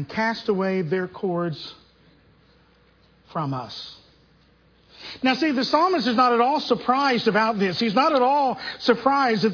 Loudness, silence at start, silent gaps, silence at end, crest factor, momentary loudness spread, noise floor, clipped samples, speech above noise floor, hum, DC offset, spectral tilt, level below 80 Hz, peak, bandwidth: -22 LUFS; 0 s; none; 0 s; 20 dB; 15 LU; -58 dBFS; under 0.1%; 36 dB; none; under 0.1%; -6 dB/octave; -64 dBFS; -4 dBFS; 5.4 kHz